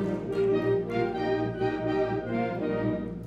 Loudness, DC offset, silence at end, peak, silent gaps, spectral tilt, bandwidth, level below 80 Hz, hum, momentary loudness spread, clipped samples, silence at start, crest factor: -28 LUFS; under 0.1%; 0 s; -16 dBFS; none; -8.5 dB/octave; 7.6 kHz; -52 dBFS; none; 4 LU; under 0.1%; 0 s; 12 dB